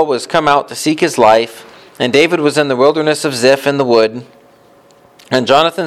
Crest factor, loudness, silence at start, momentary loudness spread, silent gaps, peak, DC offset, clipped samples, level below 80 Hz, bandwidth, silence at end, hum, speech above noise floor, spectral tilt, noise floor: 12 dB; -12 LUFS; 0 s; 7 LU; none; 0 dBFS; under 0.1%; under 0.1%; -54 dBFS; 15.5 kHz; 0 s; none; 34 dB; -4 dB/octave; -46 dBFS